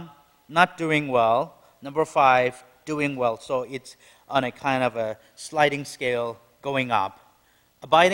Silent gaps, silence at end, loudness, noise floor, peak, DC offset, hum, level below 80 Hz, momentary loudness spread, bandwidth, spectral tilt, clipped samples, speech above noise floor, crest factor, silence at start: none; 0 s; -24 LUFS; -62 dBFS; 0 dBFS; under 0.1%; none; -64 dBFS; 14 LU; 16.5 kHz; -4.5 dB/octave; under 0.1%; 39 dB; 24 dB; 0 s